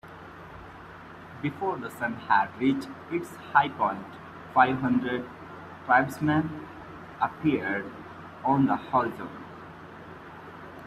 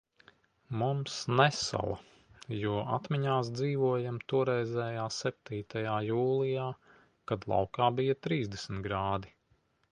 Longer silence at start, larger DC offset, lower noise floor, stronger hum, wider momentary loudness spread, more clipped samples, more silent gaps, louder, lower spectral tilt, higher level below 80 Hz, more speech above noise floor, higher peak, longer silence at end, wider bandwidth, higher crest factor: second, 0.05 s vs 0.7 s; neither; second, -45 dBFS vs -72 dBFS; neither; first, 21 LU vs 10 LU; neither; neither; first, -27 LUFS vs -32 LUFS; first, -7 dB/octave vs -5.5 dB/octave; about the same, -62 dBFS vs -60 dBFS; second, 19 dB vs 40 dB; about the same, -6 dBFS vs -8 dBFS; second, 0 s vs 0.65 s; first, 14 kHz vs 10.5 kHz; about the same, 24 dB vs 24 dB